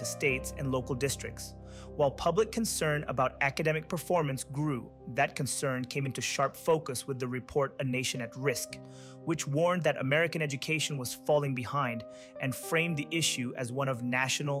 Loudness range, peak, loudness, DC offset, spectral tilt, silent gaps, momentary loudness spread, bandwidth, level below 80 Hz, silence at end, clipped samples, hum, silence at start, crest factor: 2 LU; -14 dBFS; -31 LUFS; under 0.1%; -4 dB/octave; none; 8 LU; 16 kHz; -56 dBFS; 0 s; under 0.1%; none; 0 s; 16 dB